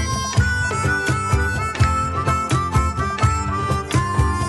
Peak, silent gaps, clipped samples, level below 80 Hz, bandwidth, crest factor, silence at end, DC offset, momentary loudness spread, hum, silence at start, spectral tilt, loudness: -6 dBFS; none; under 0.1%; -28 dBFS; 12.5 kHz; 12 dB; 0 s; under 0.1%; 3 LU; none; 0 s; -5 dB/octave; -20 LUFS